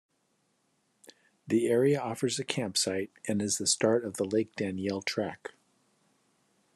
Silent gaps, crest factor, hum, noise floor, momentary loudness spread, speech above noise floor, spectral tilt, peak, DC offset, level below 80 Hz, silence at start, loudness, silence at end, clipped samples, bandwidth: none; 22 dB; none; -74 dBFS; 9 LU; 45 dB; -4 dB/octave; -10 dBFS; under 0.1%; -78 dBFS; 1.45 s; -30 LUFS; 1.3 s; under 0.1%; 13 kHz